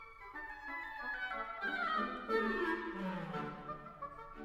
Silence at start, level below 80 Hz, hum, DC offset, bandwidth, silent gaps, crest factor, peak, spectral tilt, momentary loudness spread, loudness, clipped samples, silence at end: 0 s; -62 dBFS; none; under 0.1%; 16 kHz; none; 18 dB; -22 dBFS; -6.5 dB/octave; 12 LU; -40 LUFS; under 0.1%; 0 s